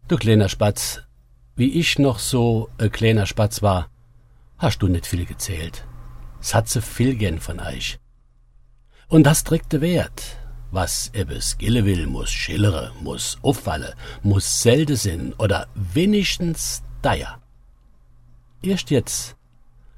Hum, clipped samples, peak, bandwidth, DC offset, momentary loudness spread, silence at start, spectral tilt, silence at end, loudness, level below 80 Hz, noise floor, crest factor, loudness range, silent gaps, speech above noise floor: none; under 0.1%; 0 dBFS; 16.5 kHz; under 0.1%; 13 LU; 0.05 s; -5 dB/octave; 0.65 s; -21 LUFS; -36 dBFS; -53 dBFS; 22 dB; 5 LU; none; 33 dB